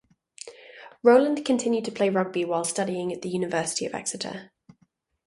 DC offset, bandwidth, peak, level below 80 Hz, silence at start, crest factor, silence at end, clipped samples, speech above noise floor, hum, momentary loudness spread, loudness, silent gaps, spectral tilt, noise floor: under 0.1%; 11.5 kHz; -4 dBFS; -70 dBFS; 0.45 s; 22 dB; 0.85 s; under 0.1%; 43 dB; none; 23 LU; -25 LUFS; none; -4 dB/octave; -68 dBFS